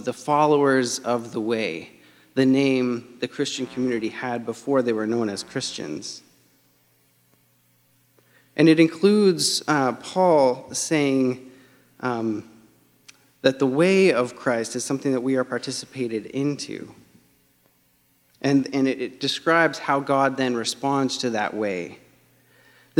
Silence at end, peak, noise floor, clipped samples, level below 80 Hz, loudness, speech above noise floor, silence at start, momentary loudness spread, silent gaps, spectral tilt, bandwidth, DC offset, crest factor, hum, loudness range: 0 s; -2 dBFS; -63 dBFS; under 0.1%; -70 dBFS; -22 LUFS; 41 dB; 0 s; 12 LU; none; -4.5 dB/octave; 15.5 kHz; under 0.1%; 20 dB; none; 8 LU